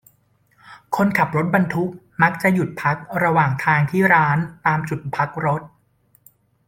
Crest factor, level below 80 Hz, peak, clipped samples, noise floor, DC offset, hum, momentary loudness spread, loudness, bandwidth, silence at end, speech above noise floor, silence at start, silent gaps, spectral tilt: 18 dB; -56 dBFS; -2 dBFS; under 0.1%; -61 dBFS; under 0.1%; none; 8 LU; -19 LUFS; 17 kHz; 1 s; 42 dB; 0.65 s; none; -7.5 dB/octave